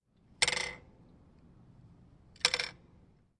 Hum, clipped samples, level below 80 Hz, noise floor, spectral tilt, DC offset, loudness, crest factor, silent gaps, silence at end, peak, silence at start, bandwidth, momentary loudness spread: none; under 0.1%; -64 dBFS; -63 dBFS; 0 dB/octave; under 0.1%; -32 LUFS; 30 dB; none; 0.65 s; -8 dBFS; 0.4 s; 11.5 kHz; 11 LU